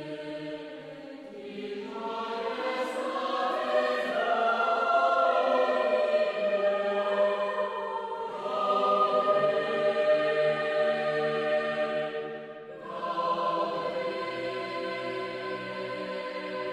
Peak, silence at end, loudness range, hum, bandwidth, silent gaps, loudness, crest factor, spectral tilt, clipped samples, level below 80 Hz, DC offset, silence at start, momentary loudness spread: -14 dBFS; 0 s; 6 LU; none; 10.5 kHz; none; -28 LUFS; 16 dB; -5 dB/octave; under 0.1%; -74 dBFS; under 0.1%; 0 s; 13 LU